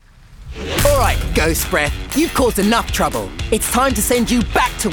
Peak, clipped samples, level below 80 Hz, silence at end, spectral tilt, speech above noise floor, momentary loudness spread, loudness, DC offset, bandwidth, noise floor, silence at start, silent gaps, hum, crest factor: -2 dBFS; under 0.1%; -26 dBFS; 0 s; -4 dB/octave; 21 dB; 6 LU; -16 LUFS; under 0.1%; 19.5 kHz; -38 dBFS; 0.3 s; none; none; 16 dB